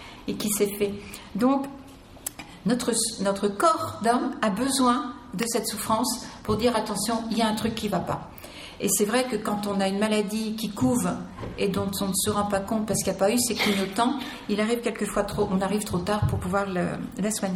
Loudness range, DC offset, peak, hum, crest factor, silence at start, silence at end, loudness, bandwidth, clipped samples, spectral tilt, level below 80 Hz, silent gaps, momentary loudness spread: 2 LU; under 0.1%; -8 dBFS; none; 18 dB; 0 s; 0 s; -26 LUFS; 17 kHz; under 0.1%; -4 dB/octave; -50 dBFS; none; 10 LU